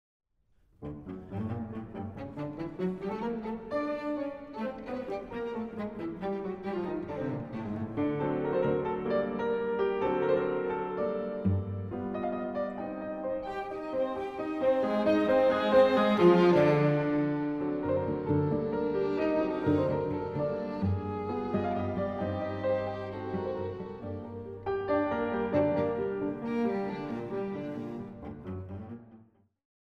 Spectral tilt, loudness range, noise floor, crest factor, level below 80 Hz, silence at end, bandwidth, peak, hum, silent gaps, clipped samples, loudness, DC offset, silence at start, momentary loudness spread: -8.5 dB/octave; 11 LU; -68 dBFS; 20 dB; -58 dBFS; 0.6 s; 7.8 kHz; -12 dBFS; none; none; under 0.1%; -31 LUFS; under 0.1%; 0.8 s; 14 LU